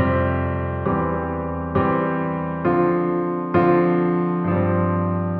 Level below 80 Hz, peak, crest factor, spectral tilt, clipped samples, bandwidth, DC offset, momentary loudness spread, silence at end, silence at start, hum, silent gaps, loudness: -40 dBFS; -6 dBFS; 16 dB; -12 dB/octave; under 0.1%; 4.3 kHz; under 0.1%; 6 LU; 0 s; 0 s; none; none; -21 LUFS